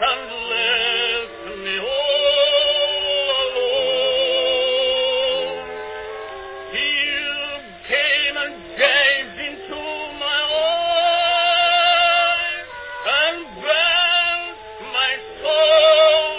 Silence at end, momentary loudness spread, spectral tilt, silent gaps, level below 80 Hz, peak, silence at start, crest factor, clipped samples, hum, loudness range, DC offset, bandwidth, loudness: 0 s; 15 LU; -5 dB/octave; none; -54 dBFS; -2 dBFS; 0 s; 16 dB; under 0.1%; none; 4 LU; under 0.1%; 4 kHz; -17 LUFS